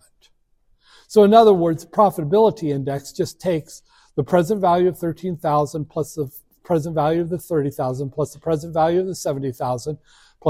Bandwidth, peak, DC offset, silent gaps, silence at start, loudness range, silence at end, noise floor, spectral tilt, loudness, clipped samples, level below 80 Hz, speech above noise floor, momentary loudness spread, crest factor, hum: 16 kHz; 0 dBFS; under 0.1%; none; 1.1 s; 5 LU; 0 s; -61 dBFS; -7 dB/octave; -20 LUFS; under 0.1%; -54 dBFS; 42 dB; 12 LU; 20 dB; none